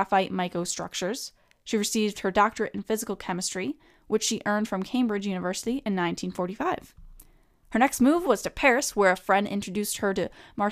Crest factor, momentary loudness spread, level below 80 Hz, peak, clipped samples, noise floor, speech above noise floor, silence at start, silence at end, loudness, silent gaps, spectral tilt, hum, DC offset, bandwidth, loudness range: 20 dB; 10 LU; -54 dBFS; -8 dBFS; under 0.1%; -57 dBFS; 31 dB; 0 s; 0 s; -27 LUFS; none; -4 dB/octave; none; under 0.1%; 15.5 kHz; 4 LU